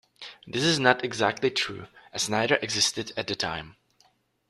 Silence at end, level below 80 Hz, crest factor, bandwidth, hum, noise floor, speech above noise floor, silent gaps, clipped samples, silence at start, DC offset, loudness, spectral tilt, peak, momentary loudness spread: 0.8 s; -62 dBFS; 24 dB; 14 kHz; none; -65 dBFS; 39 dB; none; under 0.1%; 0.2 s; under 0.1%; -25 LUFS; -3 dB/octave; -4 dBFS; 15 LU